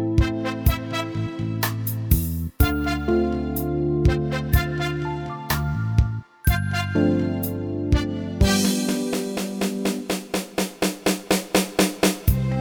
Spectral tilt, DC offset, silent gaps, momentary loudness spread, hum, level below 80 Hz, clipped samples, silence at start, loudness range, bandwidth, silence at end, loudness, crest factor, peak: -5.5 dB/octave; under 0.1%; none; 7 LU; none; -30 dBFS; under 0.1%; 0 s; 1 LU; over 20 kHz; 0 s; -23 LUFS; 18 dB; -4 dBFS